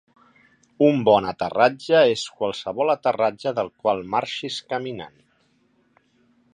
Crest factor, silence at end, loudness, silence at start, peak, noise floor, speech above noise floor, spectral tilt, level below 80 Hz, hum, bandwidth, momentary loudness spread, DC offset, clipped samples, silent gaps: 20 dB; 1.45 s; -22 LUFS; 0.8 s; -2 dBFS; -64 dBFS; 42 dB; -5 dB/octave; -62 dBFS; none; 10.5 kHz; 11 LU; under 0.1%; under 0.1%; none